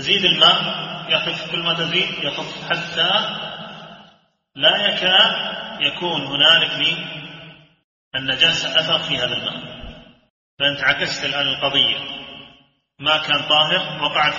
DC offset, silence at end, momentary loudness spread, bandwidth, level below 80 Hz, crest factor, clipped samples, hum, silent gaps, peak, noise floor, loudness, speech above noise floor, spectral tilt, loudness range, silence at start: under 0.1%; 0 s; 17 LU; 7.4 kHz; -54 dBFS; 20 dB; under 0.1%; none; 7.84-8.11 s, 10.30-10.57 s; 0 dBFS; -55 dBFS; -17 LUFS; 36 dB; 0.5 dB/octave; 4 LU; 0 s